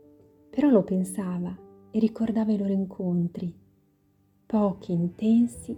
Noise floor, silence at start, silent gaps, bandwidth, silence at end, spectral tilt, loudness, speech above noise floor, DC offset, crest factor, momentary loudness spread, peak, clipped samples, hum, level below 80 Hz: -65 dBFS; 0.55 s; none; 13 kHz; 0 s; -8 dB/octave; -26 LUFS; 40 dB; under 0.1%; 18 dB; 12 LU; -8 dBFS; under 0.1%; none; -60 dBFS